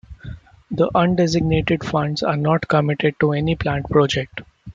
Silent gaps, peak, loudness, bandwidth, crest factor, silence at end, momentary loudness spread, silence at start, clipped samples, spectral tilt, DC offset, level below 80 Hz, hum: none; -2 dBFS; -19 LUFS; 7.6 kHz; 16 dB; 0 s; 14 LU; 0.1 s; under 0.1%; -6.5 dB/octave; under 0.1%; -42 dBFS; none